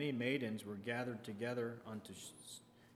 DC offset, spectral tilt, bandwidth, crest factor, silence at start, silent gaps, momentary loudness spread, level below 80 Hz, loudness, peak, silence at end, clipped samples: under 0.1%; -5 dB/octave; 15.5 kHz; 20 dB; 0 s; none; 14 LU; -84 dBFS; -43 LUFS; -24 dBFS; 0 s; under 0.1%